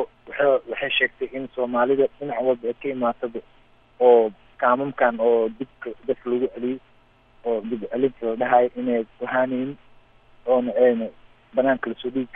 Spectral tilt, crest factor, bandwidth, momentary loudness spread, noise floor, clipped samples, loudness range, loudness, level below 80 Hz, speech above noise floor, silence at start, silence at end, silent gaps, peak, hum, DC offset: -8.5 dB/octave; 20 dB; 3.8 kHz; 12 LU; -56 dBFS; under 0.1%; 3 LU; -23 LUFS; -60 dBFS; 34 dB; 0 s; 0.1 s; none; -4 dBFS; none; under 0.1%